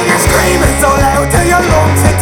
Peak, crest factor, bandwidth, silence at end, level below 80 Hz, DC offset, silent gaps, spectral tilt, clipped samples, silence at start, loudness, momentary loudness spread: 0 dBFS; 8 dB; 19.5 kHz; 0 s; -18 dBFS; under 0.1%; none; -4.5 dB/octave; under 0.1%; 0 s; -9 LUFS; 1 LU